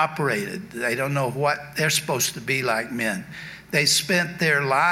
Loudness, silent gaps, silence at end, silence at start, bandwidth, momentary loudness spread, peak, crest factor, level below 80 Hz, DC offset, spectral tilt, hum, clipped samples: -22 LUFS; none; 0 s; 0 s; 16.5 kHz; 9 LU; -6 dBFS; 18 dB; -60 dBFS; under 0.1%; -3 dB/octave; none; under 0.1%